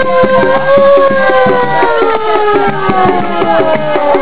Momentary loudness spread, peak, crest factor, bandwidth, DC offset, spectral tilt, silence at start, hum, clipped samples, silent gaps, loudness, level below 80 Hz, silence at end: 5 LU; 0 dBFS; 10 dB; 4 kHz; 10%; -9.5 dB/octave; 0 s; none; 0.3%; none; -9 LUFS; -40 dBFS; 0 s